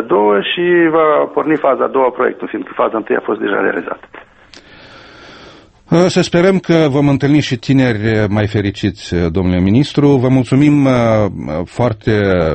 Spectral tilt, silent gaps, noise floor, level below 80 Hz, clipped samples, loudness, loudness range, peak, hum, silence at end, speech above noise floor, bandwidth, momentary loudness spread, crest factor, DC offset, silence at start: -7 dB/octave; none; -41 dBFS; -40 dBFS; under 0.1%; -13 LUFS; 6 LU; 0 dBFS; none; 0 s; 28 dB; 8.6 kHz; 7 LU; 14 dB; under 0.1%; 0 s